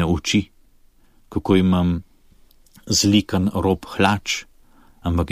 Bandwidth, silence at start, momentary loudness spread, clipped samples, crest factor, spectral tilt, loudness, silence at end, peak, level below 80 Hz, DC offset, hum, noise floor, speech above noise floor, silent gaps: 15.5 kHz; 0 s; 12 LU; under 0.1%; 18 dB; -5 dB/octave; -20 LUFS; 0 s; -2 dBFS; -40 dBFS; under 0.1%; none; -53 dBFS; 34 dB; none